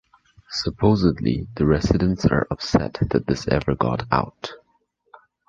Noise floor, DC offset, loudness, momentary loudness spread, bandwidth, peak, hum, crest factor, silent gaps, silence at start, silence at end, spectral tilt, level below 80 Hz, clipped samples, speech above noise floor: -67 dBFS; under 0.1%; -22 LUFS; 8 LU; 7.6 kHz; -2 dBFS; none; 20 dB; none; 0.5 s; 0.9 s; -7 dB/octave; -36 dBFS; under 0.1%; 46 dB